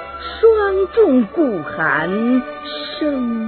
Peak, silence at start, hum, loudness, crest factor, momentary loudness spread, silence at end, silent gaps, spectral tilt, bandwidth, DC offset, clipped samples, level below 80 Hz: -2 dBFS; 0 s; none; -17 LUFS; 16 dB; 12 LU; 0 s; none; -9.5 dB/octave; 4.5 kHz; under 0.1%; under 0.1%; -46 dBFS